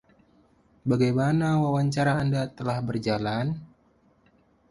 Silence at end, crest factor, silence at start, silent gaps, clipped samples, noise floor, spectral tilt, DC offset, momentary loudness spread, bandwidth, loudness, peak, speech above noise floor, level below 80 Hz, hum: 1.05 s; 16 dB; 0.85 s; none; under 0.1%; -63 dBFS; -7.5 dB/octave; under 0.1%; 7 LU; 11.5 kHz; -26 LUFS; -10 dBFS; 38 dB; -56 dBFS; none